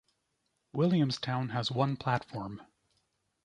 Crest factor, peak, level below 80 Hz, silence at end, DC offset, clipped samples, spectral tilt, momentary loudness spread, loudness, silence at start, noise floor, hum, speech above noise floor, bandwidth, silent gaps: 20 dB; -14 dBFS; -66 dBFS; 0.8 s; under 0.1%; under 0.1%; -6.5 dB/octave; 13 LU; -32 LUFS; 0.75 s; -79 dBFS; none; 49 dB; 10.5 kHz; none